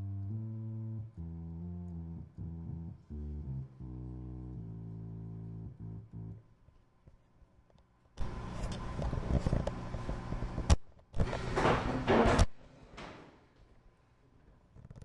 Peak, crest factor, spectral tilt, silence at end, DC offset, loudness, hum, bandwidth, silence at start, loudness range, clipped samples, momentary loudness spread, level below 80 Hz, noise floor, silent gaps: -12 dBFS; 26 dB; -6.5 dB/octave; 0 s; under 0.1%; -37 LUFS; none; 11.5 kHz; 0 s; 15 LU; under 0.1%; 17 LU; -42 dBFS; -66 dBFS; none